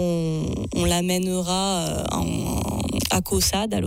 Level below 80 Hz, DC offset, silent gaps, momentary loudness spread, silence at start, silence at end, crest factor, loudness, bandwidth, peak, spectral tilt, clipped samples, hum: -36 dBFS; under 0.1%; none; 5 LU; 0 s; 0 s; 14 dB; -23 LUFS; 16.5 kHz; -10 dBFS; -4.5 dB/octave; under 0.1%; none